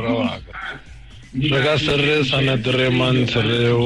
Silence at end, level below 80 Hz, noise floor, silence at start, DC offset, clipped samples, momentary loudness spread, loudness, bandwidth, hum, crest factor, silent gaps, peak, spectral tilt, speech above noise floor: 0 s; -42 dBFS; -40 dBFS; 0 s; under 0.1%; under 0.1%; 14 LU; -18 LUFS; 11.5 kHz; none; 10 dB; none; -8 dBFS; -6 dB/octave; 22 dB